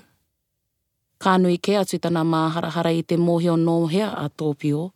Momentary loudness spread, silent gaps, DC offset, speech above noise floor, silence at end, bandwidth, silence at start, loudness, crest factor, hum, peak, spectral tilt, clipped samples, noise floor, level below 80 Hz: 6 LU; none; under 0.1%; 56 dB; 0.05 s; 14.5 kHz; 1.2 s; -21 LUFS; 18 dB; none; -4 dBFS; -6.5 dB/octave; under 0.1%; -76 dBFS; -70 dBFS